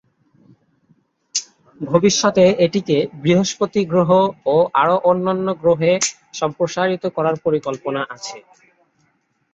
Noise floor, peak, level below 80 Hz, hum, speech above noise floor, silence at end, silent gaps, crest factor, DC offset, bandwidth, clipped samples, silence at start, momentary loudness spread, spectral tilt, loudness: -64 dBFS; -2 dBFS; -58 dBFS; none; 47 dB; 1.15 s; none; 16 dB; under 0.1%; 8 kHz; under 0.1%; 1.35 s; 10 LU; -4.5 dB/octave; -18 LUFS